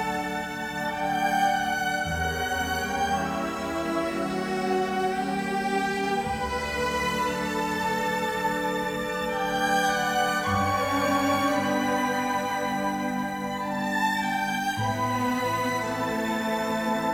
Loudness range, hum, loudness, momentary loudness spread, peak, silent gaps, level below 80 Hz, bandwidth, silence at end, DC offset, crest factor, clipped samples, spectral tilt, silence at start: 3 LU; none; -26 LUFS; 5 LU; -12 dBFS; none; -50 dBFS; 18 kHz; 0 s; under 0.1%; 14 dB; under 0.1%; -4 dB/octave; 0 s